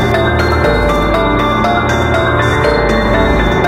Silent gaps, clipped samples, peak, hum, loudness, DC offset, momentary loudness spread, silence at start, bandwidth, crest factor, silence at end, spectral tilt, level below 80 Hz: none; under 0.1%; 0 dBFS; none; -12 LUFS; under 0.1%; 1 LU; 0 s; 16 kHz; 10 dB; 0 s; -6 dB/octave; -20 dBFS